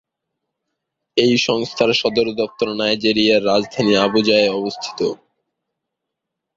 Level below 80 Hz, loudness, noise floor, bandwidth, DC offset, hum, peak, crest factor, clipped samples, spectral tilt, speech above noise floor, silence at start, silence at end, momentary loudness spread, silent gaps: -56 dBFS; -17 LUFS; -81 dBFS; 7.8 kHz; under 0.1%; none; -2 dBFS; 18 dB; under 0.1%; -4.5 dB/octave; 64 dB; 1.15 s; 1.4 s; 9 LU; none